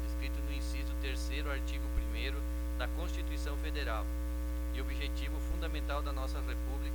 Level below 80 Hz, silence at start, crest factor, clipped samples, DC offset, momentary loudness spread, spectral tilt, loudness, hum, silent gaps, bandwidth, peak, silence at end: -36 dBFS; 0 s; 14 dB; under 0.1%; under 0.1%; 2 LU; -5.5 dB/octave; -38 LUFS; 60 Hz at -35 dBFS; none; 19 kHz; -22 dBFS; 0 s